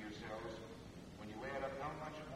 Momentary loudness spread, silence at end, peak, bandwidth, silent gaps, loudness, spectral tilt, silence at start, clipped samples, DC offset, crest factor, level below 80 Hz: 9 LU; 0 s; -30 dBFS; 16 kHz; none; -48 LUFS; -5.5 dB/octave; 0 s; under 0.1%; under 0.1%; 18 dB; -64 dBFS